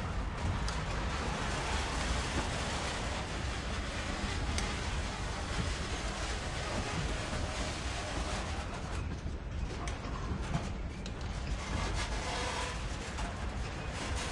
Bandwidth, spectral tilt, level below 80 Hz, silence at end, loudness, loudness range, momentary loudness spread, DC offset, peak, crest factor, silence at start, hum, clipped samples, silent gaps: 11.5 kHz; -4 dB/octave; -40 dBFS; 0 s; -37 LUFS; 3 LU; 5 LU; under 0.1%; -20 dBFS; 16 dB; 0 s; none; under 0.1%; none